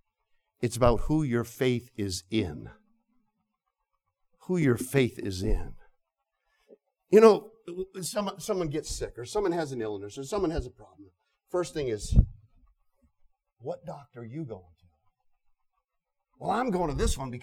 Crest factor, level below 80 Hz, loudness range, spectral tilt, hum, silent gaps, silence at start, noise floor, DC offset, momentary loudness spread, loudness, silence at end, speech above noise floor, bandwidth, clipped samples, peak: 24 dB; -40 dBFS; 12 LU; -6 dB/octave; none; none; 0.6 s; -83 dBFS; under 0.1%; 16 LU; -28 LUFS; 0 s; 55 dB; 16.5 kHz; under 0.1%; -6 dBFS